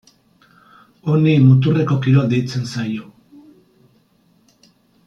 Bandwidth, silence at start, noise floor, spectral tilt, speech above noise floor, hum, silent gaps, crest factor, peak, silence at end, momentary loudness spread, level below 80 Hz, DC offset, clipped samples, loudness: 7.4 kHz; 1.05 s; -57 dBFS; -8 dB/octave; 43 dB; none; none; 16 dB; -2 dBFS; 2.05 s; 14 LU; -58 dBFS; under 0.1%; under 0.1%; -16 LUFS